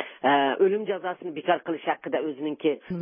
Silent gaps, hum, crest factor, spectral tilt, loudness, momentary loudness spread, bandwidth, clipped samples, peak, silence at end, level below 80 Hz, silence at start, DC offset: none; none; 18 dB; -9.5 dB/octave; -26 LUFS; 9 LU; 3.7 kHz; under 0.1%; -8 dBFS; 0 s; -74 dBFS; 0 s; under 0.1%